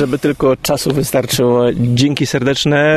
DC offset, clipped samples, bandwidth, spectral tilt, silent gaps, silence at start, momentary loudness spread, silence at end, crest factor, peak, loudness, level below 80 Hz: under 0.1%; under 0.1%; 13.5 kHz; -5 dB/octave; none; 0 s; 3 LU; 0 s; 14 dB; 0 dBFS; -14 LUFS; -40 dBFS